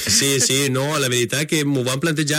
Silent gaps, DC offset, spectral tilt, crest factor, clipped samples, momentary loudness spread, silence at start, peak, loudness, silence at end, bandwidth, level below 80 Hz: none; under 0.1%; -3 dB/octave; 14 dB; under 0.1%; 5 LU; 0 s; -4 dBFS; -18 LUFS; 0 s; 16.5 kHz; -56 dBFS